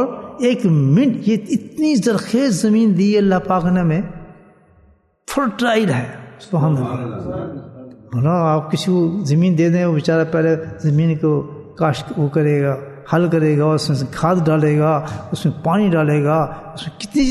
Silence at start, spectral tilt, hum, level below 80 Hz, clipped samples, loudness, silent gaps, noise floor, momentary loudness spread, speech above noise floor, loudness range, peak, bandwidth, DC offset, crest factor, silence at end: 0 s; -7 dB/octave; none; -46 dBFS; under 0.1%; -17 LUFS; none; -53 dBFS; 12 LU; 37 dB; 5 LU; -2 dBFS; 12.5 kHz; under 0.1%; 14 dB; 0 s